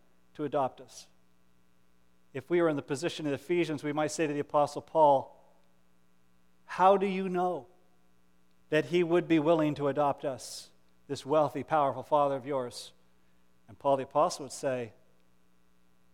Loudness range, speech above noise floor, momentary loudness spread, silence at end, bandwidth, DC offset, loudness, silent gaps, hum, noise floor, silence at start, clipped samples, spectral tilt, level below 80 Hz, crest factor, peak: 5 LU; 41 dB; 16 LU; 1.25 s; 15.5 kHz; under 0.1%; -30 LUFS; none; 60 Hz at -60 dBFS; -70 dBFS; 0.4 s; under 0.1%; -5.5 dB/octave; -74 dBFS; 20 dB; -12 dBFS